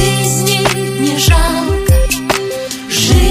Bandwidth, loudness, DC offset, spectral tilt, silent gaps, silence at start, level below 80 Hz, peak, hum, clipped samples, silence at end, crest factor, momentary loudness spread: 15.5 kHz; -13 LUFS; under 0.1%; -4 dB/octave; none; 0 s; -18 dBFS; 0 dBFS; none; under 0.1%; 0 s; 12 dB; 6 LU